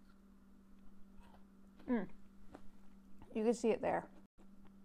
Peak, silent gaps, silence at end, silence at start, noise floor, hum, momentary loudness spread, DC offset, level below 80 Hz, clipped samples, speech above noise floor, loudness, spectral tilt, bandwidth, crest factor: -22 dBFS; 4.26-4.38 s; 0 s; 0 s; -62 dBFS; none; 27 LU; under 0.1%; -66 dBFS; under 0.1%; 25 dB; -39 LUFS; -6 dB/octave; 11.5 kHz; 22 dB